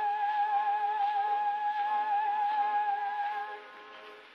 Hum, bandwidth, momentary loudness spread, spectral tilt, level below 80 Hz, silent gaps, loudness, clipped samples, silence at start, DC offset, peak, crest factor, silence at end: none; 5.8 kHz; 16 LU; -1.5 dB/octave; under -90 dBFS; none; -30 LUFS; under 0.1%; 0 s; under 0.1%; -20 dBFS; 10 dB; 0 s